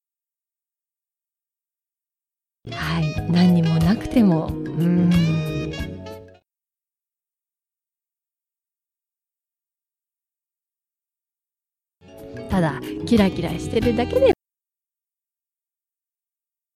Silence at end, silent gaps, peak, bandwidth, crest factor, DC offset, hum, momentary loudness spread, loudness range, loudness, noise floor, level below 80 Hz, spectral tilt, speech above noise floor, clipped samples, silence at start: 2.45 s; none; -6 dBFS; 14 kHz; 18 dB; under 0.1%; none; 14 LU; 12 LU; -20 LUFS; under -90 dBFS; -44 dBFS; -7.5 dB/octave; over 71 dB; under 0.1%; 2.65 s